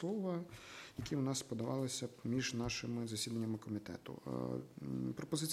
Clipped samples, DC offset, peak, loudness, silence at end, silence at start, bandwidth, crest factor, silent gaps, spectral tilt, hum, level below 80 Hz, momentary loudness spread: under 0.1%; under 0.1%; -24 dBFS; -42 LUFS; 0 s; 0 s; 16 kHz; 18 dB; none; -5 dB/octave; none; -66 dBFS; 9 LU